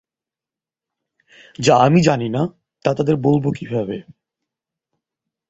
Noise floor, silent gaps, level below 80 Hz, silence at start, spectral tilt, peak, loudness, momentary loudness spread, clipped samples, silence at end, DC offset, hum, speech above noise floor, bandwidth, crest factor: -89 dBFS; none; -54 dBFS; 1.6 s; -6.5 dB/octave; -2 dBFS; -18 LUFS; 12 LU; under 0.1%; 1.5 s; under 0.1%; none; 73 dB; 8.2 kHz; 20 dB